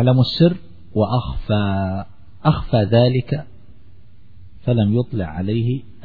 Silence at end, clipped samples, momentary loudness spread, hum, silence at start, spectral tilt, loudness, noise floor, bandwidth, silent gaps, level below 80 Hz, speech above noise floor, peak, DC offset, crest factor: 0.15 s; under 0.1%; 11 LU; none; 0 s; -10 dB/octave; -19 LUFS; -48 dBFS; 4.9 kHz; none; -38 dBFS; 31 dB; -2 dBFS; 1%; 16 dB